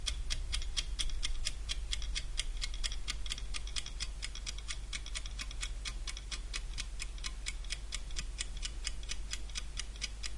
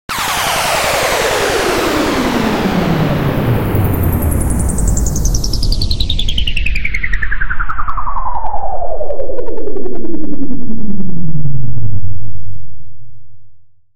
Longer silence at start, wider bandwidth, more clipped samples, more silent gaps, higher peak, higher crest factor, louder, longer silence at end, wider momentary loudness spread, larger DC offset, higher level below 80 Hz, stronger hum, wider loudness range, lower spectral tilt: about the same, 0 s vs 0.1 s; second, 11.5 kHz vs 16.5 kHz; second, under 0.1% vs 0.3%; neither; second, -16 dBFS vs 0 dBFS; first, 22 dB vs 10 dB; second, -40 LUFS vs -17 LUFS; about the same, 0 s vs 0 s; second, 5 LU vs 10 LU; neither; second, -40 dBFS vs -22 dBFS; neither; second, 3 LU vs 9 LU; second, -1 dB/octave vs -4.5 dB/octave